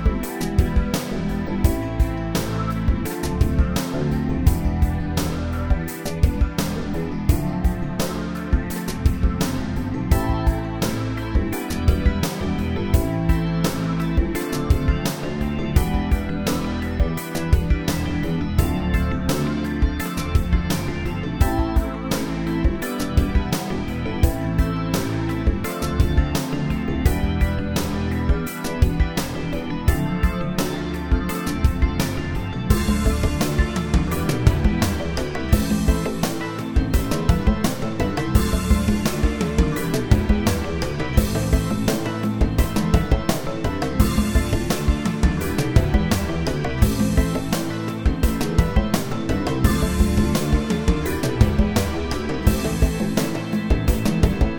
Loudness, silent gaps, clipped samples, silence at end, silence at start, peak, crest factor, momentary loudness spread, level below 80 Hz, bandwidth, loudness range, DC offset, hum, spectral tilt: -22 LUFS; none; under 0.1%; 0 s; 0 s; 0 dBFS; 20 dB; 5 LU; -24 dBFS; over 20 kHz; 2 LU; under 0.1%; none; -6 dB/octave